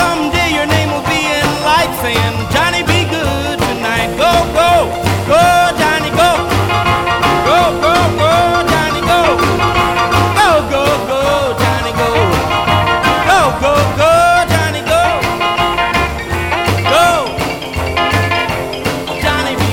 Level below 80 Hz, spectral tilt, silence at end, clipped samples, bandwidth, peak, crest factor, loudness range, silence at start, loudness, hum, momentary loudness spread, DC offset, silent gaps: -30 dBFS; -4.5 dB/octave; 0 s; under 0.1%; 19 kHz; 0 dBFS; 12 dB; 2 LU; 0 s; -12 LUFS; none; 5 LU; under 0.1%; none